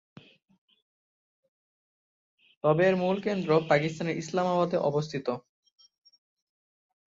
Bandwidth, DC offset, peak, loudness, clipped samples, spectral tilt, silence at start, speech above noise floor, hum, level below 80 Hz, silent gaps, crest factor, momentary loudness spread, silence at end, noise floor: 7.8 kHz; under 0.1%; -10 dBFS; -27 LUFS; under 0.1%; -6.5 dB/octave; 2.65 s; over 64 dB; none; -70 dBFS; none; 22 dB; 9 LU; 1.7 s; under -90 dBFS